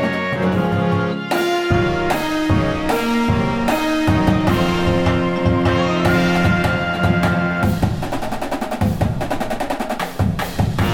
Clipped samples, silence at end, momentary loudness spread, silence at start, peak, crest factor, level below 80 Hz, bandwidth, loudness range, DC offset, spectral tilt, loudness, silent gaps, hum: under 0.1%; 0 s; 7 LU; 0 s; -4 dBFS; 14 dB; -32 dBFS; 18 kHz; 4 LU; under 0.1%; -6.5 dB/octave; -18 LUFS; none; none